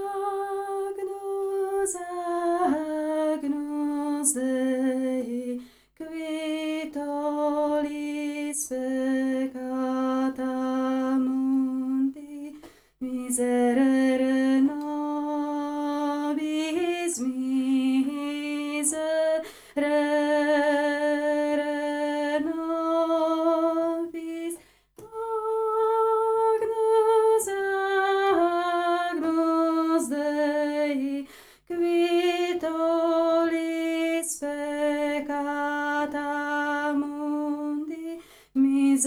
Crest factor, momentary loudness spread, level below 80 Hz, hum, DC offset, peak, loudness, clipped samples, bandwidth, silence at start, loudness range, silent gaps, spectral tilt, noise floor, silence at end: 16 dB; 9 LU; -68 dBFS; none; under 0.1%; -10 dBFS; -26 LUFS; under 0.1%; over 20 kHz; 0 s; 5 LU; none; -2.5 dB/octave; -50 dBFS; 0 s